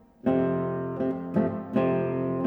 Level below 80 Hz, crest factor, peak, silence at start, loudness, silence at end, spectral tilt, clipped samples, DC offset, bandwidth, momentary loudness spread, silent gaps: -60 dBFS; 14 dB; -12 dBFS; 0.25 s; -27 LUFS; 0 s; -10.5 dB/octave; under 0.1%; under 0.1%; 4.2 kHz; 5 LU; none